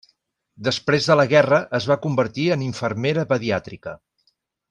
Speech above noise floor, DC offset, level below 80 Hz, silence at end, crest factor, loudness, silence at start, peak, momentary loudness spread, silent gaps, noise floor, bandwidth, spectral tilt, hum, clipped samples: 48 dB; under 0.1%; -60 dBFS; 0.75 s; 18 dB; -20 LUFS; 0.6 s; -4 dBFS; 11 LU; none; -68 dBFS; 10 kHz; -5.5 dB/octave; none; under 0.1%